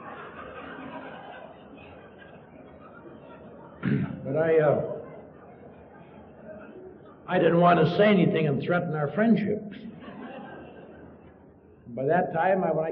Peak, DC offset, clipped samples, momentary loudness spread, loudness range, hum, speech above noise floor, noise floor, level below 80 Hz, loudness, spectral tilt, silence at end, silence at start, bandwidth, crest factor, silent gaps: -8 dBFS; under 0.1%; under 0.1%; 26 LU; 14 LU; none; 30 dB; -53 dBFS; -62 dBFS; -24 LUFS; -6 dB/octave; 0 s; 0 s; 5.6 kHz; 20 dB; none